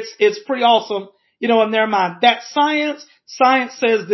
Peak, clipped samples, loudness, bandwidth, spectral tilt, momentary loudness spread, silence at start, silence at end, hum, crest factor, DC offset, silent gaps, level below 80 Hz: -2 dBFS; under 0.1%; -17 LUFS; 6.2 kHz; -4 dB/octave; 10 LU; 0 s; 0 s; none; 16 dB; under 0.1%; none; -76 dBFS